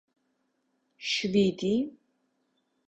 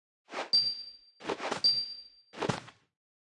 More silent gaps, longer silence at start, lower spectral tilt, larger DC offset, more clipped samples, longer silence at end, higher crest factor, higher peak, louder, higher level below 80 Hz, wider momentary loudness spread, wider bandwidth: neither; first, 1 s vs 0.3 s; first, -5 dB/octave vs -3 dB/octave; neither; neither; first, 0.95 s vs 0.65 s; about the same, 20 dB vs 22 dB; about the same, -12 dBFS vs -14 dBFS; about the same, -28 LUFS vs -30 LUFS; first, -66 dBFS vs -74 dBFS; second, 12 LU vs 18 LU; second, 8.2 kHz vs 11.5 kHz